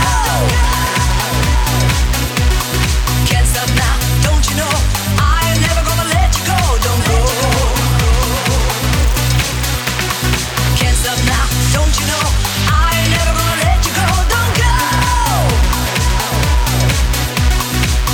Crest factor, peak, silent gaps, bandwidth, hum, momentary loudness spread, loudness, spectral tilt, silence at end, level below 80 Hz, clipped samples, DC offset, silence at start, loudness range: 12 dB; 0 dBFS; none; 18.5 kHz; none; 2 LU; -14 LUFS; -3.5 dB/octave; 0 s; -16 dBFS; under 0.1%; under 0.1%; 0 s; 1 LU